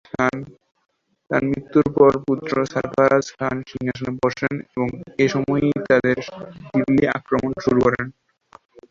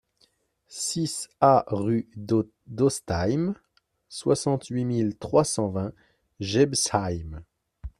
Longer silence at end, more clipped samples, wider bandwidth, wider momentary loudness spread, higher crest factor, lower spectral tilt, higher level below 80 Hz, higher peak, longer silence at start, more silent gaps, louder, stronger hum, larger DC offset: first, 0.8 s vs 0.1 s; neither; second, 7.4 kHz vs 14.5 kHz; second, 9 LU vs 14 LU; about the same, 20 dB vs 22 dB; first, -7 dB/octave vs -5 dB/octave; about the same, -50 dBFS vs -52 dBFS; about the same, -2 dBFS vs -4 dBFS; second, 0.15 s vs 0.7 s; neither; first, -20 LUFS vs -26 LUFS; neither; neither